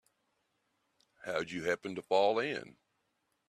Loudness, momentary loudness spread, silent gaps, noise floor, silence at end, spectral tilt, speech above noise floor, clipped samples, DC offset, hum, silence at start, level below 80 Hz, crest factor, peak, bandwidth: -34 LUFS; 11 LU; none; -80 dBFS; 0.8 s; -4.5 dB/octave; 47 dB; under 0.1%; under 0.1%; none; 1.25 s; -78 dBFS; 20 dB; -16 dBFS; 13 kHz